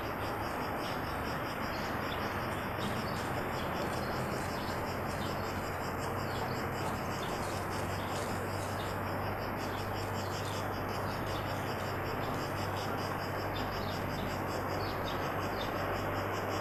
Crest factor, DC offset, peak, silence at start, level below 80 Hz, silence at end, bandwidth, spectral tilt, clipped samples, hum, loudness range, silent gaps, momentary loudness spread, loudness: 14 dB; under 0.1%; -22 dBFS; 0 s; -52 dBFS; 0 s; 13.5 kHz; -5 dB/octave; under 0.1%; none; 1 LU; none; 1 LU; -36 LUFS